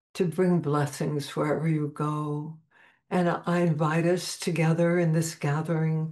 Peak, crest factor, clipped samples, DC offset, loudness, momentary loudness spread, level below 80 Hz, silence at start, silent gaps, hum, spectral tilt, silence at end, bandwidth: -14 dBFS; 14 dB; under 0.1%; under 0.1%; -27 LUFS; 6 LU; -72 dBFS; 0.15 s; none; none; -6.5 dB/octave; 0 s; 12.5 kHz